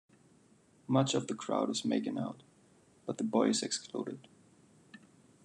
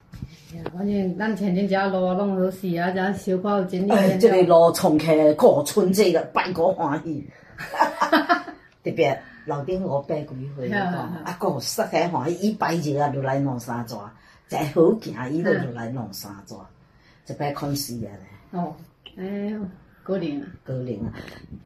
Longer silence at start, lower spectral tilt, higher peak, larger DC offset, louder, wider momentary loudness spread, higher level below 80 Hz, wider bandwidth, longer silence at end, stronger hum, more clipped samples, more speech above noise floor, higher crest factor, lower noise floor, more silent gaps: first, 0.9 s vs 0.15 s; second, -4.5 dB/octave vs -6 dB/octave; second, -14 dBFS vs -4 dBFS; neither; second, -34 LUFS vs -23 LUFS; about the same, 16 LU vs 18 LU; second, -82 dBFS vs -56 dBFS; second, 11 kHz vs 14.5 kHz; first, 0.5 s vs 0.05 s; neither; neither; about the same, 32 dB vs 32 dB; about the same, 22 dB vs 20 dB; first, -65 dBFS vs -55 dBFS; neither